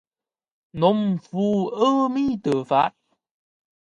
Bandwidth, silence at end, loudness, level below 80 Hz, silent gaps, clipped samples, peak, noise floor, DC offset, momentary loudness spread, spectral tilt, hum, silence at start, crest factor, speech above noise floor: 10 kHz; 1.1 s; -22 LUFS; -60 dBFS; none; under 0.1%; -6 dBFS; under -90 dBFS; under 0.1%; 5 LU; -7.5 dB/octave; none; 0.75 s; 18 dB; over 69 dB